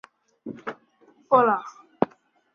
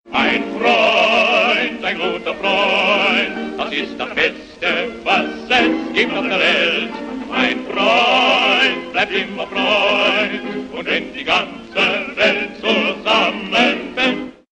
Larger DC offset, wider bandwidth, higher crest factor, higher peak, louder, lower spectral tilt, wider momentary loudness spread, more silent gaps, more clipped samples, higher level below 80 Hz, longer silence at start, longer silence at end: neither; second, 6.8 kHz vs 9.4 kHz; first, 24 dB vs 16 dB; about the same, -2 dBFS vs 0 dBFS; second, -23 LUFS vs -16 LUFS; first, -7 dB/octave vs -3.5 dB/octave; first, 22 LU vs 9 LU; neither; neither; second, -72 dBFS vs -52 dBFS; first, 0.45 s vs 0.05 s; first, 0.5 s vs 0.2 s